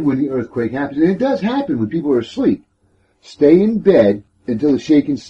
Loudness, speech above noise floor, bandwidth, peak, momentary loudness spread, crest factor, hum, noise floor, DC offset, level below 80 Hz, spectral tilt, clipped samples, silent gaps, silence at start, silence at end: -16 LUFS; 44 dB; 8 kHz; 0 dBFS; 9 LU; 14 dB; none; -59 dBFS; under 0.1%; -52 dBFS; -8 dB/octave; under 0.1%; none; 0 s; 0 s